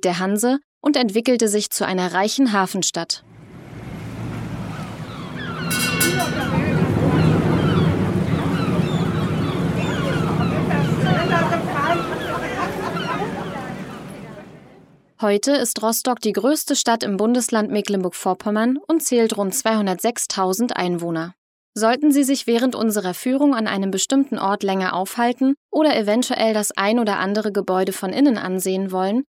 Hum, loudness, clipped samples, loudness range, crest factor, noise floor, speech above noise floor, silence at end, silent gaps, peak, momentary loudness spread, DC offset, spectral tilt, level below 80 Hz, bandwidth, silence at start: none; -20 LUFS; under 0.1%; 5 LU; 18 dB; -49 dBFS; 30 dB; 0.1 s; 0.64-0.81 s, 21.38-21.73 s, 25.57-25.69 s; -2 dBFS; 11 LU; under 0.1%; -5 dB/octave; -46 dBFS; 16.5 kHz; 0.05 s